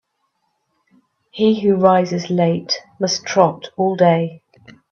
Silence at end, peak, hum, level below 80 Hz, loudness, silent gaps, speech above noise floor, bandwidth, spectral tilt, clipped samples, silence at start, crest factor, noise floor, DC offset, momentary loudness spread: 0.55 s; 0 dBFS; none; -62 dBFS; -17 LUFS; none; 53 dB; 7.2 kHz; -5.5 dB/octave; under 0.1%; 1.35 s; 18 dB; -70 dBFS; under 0.1%; 7 LU